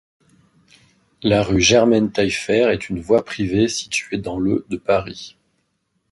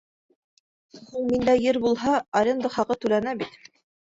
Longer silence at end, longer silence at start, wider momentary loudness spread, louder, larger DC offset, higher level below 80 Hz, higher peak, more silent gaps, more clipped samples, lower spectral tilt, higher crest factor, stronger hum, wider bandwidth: first, 0.85 s vs 0.65 s; first, 1.25 s vs 0.95 s; about the same, 10 LU vs 11 LU; first, -18 LUFS vs -24 LUFS; neither; first, -44 dBFS vs -58 dBFS; first, -2 dBFS vs -8 dBFS; second, none vs 2.28-2.32 s; neither; about the same, -4.5 dB/octave vs -5.5 dB/octave; about the same, 18 dB vs 16 dB; neither; first, 11.5 kHz vs 7.8 kHz